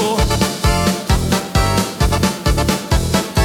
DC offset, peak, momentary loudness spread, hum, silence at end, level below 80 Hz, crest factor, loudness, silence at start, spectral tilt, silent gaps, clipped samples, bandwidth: under 0.1%; -4 dBFS; 2 LU; none; 0 s; -22 dBFS; 12 dB; -16 LUFS; 0 s; -4.5 dB/octave; none; under 0.1%; 18 kHz